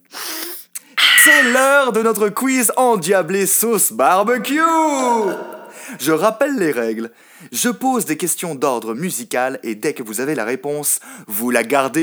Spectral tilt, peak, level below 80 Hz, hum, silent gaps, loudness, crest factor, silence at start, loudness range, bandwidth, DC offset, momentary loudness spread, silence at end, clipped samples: -2 dB/octave; 0 dBFS; -76 dBFS; none; none; -16 LUFS; 16 dB; 0.15 s; 8 LU; over 20 kHz; under 0.1%; 13 LU; 0 s; under 0.1%